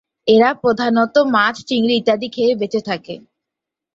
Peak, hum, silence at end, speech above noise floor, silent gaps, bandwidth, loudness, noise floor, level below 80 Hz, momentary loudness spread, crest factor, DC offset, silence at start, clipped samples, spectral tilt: -2 dBFS; none; 0.8 s; 68 dB; none; 7.8 kHz; -16 LUFS; -84 dBFS; -60 dBFS; 12 LU; 16 dB; under 0.1%; 0.25 s; under 0.1%; -5 dB/octave